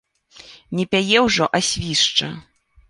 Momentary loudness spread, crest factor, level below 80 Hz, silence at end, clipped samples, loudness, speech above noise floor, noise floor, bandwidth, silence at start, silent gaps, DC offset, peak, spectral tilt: 13 LU; 20 dB; -48 dBFS; 0.5 s; under 0.1%; -18 LUFS; 27 dB; -46 dBFS; 11.5 kHz; 0.5 s; none; under 0.1%; -2 dBFS; -3 dB/octave